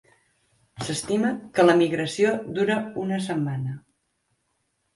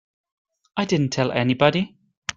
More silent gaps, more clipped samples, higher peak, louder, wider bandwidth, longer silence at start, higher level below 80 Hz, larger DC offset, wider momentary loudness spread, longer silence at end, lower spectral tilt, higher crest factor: second, none vs 2.17-2.22 s; neither; second, -6 dBFS vs -2 dBFS; about the same, -24 LUFS vs -22 LUFS; first, 11.5 kHz vs 9 kHz; about the same, 0.75 s vs 0.75 s; about the same, -62 dBFS vs -58 dBFS; neither; about the same, 13 LU vs 13 LU; first, 1.15 s vs 0.05 s; about the same, -5.5 dB/octave vs -5.5 dB/octave; about the same, 20 dB vs 22 dB